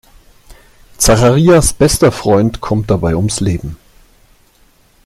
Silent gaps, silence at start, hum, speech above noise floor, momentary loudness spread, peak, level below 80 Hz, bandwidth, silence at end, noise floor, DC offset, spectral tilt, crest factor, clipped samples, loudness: none; 0.5 s; none; 39 dB; 9 LU; 0 dBFS; -28 dBFS; 15.5 kHz; 1.3 s; -50 dBFS; under 0.1%; -5 dB/octave; 14 dB; under 0.1%; -12 LUFS